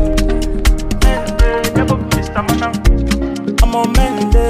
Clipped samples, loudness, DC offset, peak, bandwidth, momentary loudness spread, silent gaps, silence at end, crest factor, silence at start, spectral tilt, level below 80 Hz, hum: under 0.1%; -15 LUFS; under 0.1%; 0 dBFS; 15.5 kHz; 3 LU; none; 0 s; 12 dB; 0 s; -5.5 dB/octave; -14 dBFS; none